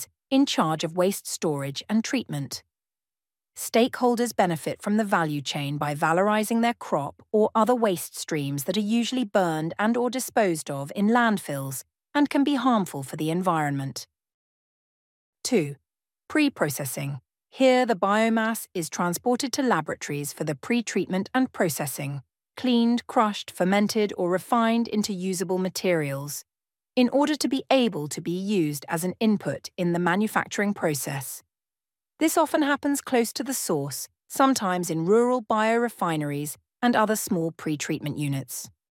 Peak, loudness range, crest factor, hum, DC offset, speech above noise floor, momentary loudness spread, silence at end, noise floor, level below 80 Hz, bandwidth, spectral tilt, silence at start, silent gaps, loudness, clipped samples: -6 dBFS; 3 LU; 18 dB; none; under 0.1%; over 65 dB; 9 LU; 0.25 s; under -90 dBFS; -72 dBFS; 17 kHz; -4.5 dB/octave; 0 s; 14.34-15.33 s; -25 LUFS; under 0.1%